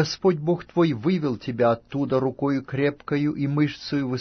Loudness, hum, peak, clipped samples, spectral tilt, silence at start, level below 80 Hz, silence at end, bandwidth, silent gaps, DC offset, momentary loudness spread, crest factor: -24 LUFS; none; -8 dBFS; under 0.1%; -7 dB/octave; 0 s; -58 dBFS; 0 s; 6.6 kHz; none; under 0.1%; 4 LU; 16 dB